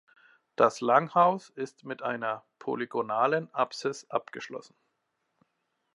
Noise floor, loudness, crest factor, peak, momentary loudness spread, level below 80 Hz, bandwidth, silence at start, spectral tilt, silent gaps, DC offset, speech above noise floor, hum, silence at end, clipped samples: -79 dBFS; -28 LUFS; 22 dB; -8 dBFS; 16 LU; -86 dBFS; 11.5 kHz; 0.6 s; -5 dB/octave; none; under 0.1%; 51 dB; none; 1.35 s; under 0.1%